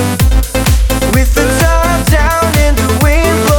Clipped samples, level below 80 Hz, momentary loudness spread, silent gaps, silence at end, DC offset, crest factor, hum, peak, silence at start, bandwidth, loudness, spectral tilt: under 0.1%; -12 dBFS; 2 LU; none; 0 s; under 0.1%; 8 dB; none; 0 dBFS; 0 s; 19.5 kHz; -11 LUFS; -5 dB/octave